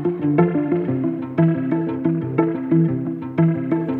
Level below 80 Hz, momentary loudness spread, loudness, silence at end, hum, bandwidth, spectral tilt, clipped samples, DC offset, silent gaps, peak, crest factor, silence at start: -60 dBFS; 5 LU; -20 LUFS; 0 s; none; 3.7 kHz; -12 dB/octave; under 0.1%; under 0.1%; none; -4 dBFS; 16 dB; 0 s